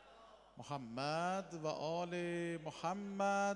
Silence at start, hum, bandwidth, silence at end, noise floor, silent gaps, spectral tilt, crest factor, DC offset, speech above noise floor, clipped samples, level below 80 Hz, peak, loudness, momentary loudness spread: 0 s; none; 11.5 kHz; 0 s; -62 dBFS; none; -5 dB/octave; 16 dB; under 0.1%; 22 dB; under 0.1%; -76 dBFS; -24 dBFS; -41 LUFS; 17 LU